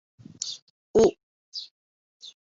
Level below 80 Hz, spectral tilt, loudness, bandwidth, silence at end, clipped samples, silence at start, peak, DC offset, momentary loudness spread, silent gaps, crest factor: -56 dBFS; -4 dB/octave; -26 LUFS; 7.8 kHz; 0.1 s; under 0.1%; 0.4 s; -8 dBFS; under 0.1%; 24 LU; 0.62-0.94 s, 1.23-1.52 s, 1.71-2.20 s; 20 dB